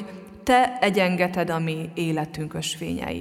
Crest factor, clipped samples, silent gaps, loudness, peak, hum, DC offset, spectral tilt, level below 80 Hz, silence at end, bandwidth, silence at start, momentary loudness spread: 18 dB; under 0.1%; none; -24 LUFS; -6 dBFS; none; under 0.1%; -5 dB/octave; -52 dBFS; 0 s; 16 kHz; 0 s; 10 LU